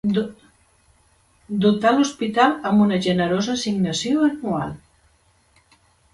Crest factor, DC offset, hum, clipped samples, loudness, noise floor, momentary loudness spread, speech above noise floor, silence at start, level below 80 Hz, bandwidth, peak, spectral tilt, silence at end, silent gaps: 18 dB; under 0.1%; none; under 0.1%; -20 LUFS; -60 dBFS; 10 LU; 40 dB; 0.05 s; -56 dBFS; 11.5 kHz; -4 dBFS; -5.5 dB/octave; 1.4 s; none